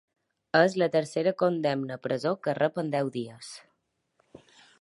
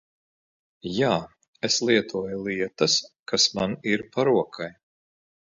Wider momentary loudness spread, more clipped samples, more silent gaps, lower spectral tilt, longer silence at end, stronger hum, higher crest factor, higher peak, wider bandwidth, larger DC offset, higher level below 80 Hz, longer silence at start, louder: first, 15 LU vs 11 LU; neither; second, none vs 1.48-1.53 s, 3.19-3.26 s; first, -6 dB/octave vs -3 dB/octave; second, 0.45 s vs 0.85 s; neither; about the same, 22 dB vs 22 dB; second, -8 dBFS vs -4 dBFS; first, 11.5 kHz vs 7.8 kHz; neither; second, -76 dBFS vs -62 dBFS; second, 0.55 s vs 0.85 s; second, -27 LUFS vs -24 LUFS